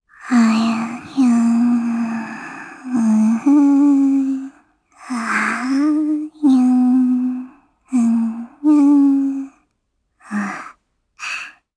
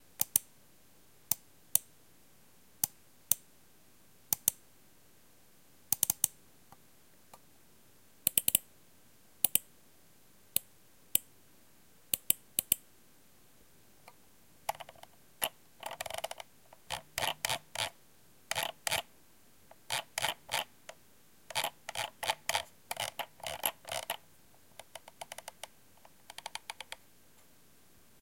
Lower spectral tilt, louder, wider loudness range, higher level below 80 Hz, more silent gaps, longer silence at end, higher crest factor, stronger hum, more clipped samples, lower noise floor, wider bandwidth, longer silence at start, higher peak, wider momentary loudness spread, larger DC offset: first, -5.5 dB/octave vs 0 dB/octave; first, -17 LUFS vs -34 LUFS; second, 2 LU vs 9 LU; about the same, -68 dBFS vs -72 dBFS; neither; second, 0.25 s vs 1.25 s; second, 14 dB vs 36 dB; neither; neither; first, -70 dBFS vs -64 dBFS; second, 11 kHz vs 17 kHz; about the same, 0.2 s vs 0.2 s; about the same, -4 dBFS vs -4 dBFS; second, 15 LU vs 18 LU; neither